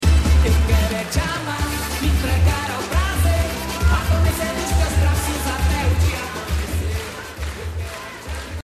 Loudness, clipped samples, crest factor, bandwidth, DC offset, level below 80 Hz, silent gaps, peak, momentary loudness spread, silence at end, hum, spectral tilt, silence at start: -21 LUFS; under 0.1%; 14 dB; 14 kHz; under 0.1%; -22 dBFS; none; -4 dBFS; 12 LU; 0.05 s; none; -5 dB/octave; 0 s